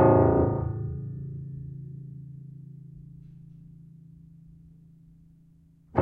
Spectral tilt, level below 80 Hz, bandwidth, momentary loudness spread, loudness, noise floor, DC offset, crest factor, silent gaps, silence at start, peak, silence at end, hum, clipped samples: -13 dB/octave; -50 dBFS; 2.8 kHz; 28 LU; -28 LUFS; -58 dBFS; under 0.1%; 22 dB; none; 0 s; -6 dBFS; 0 s; none; under 0.1%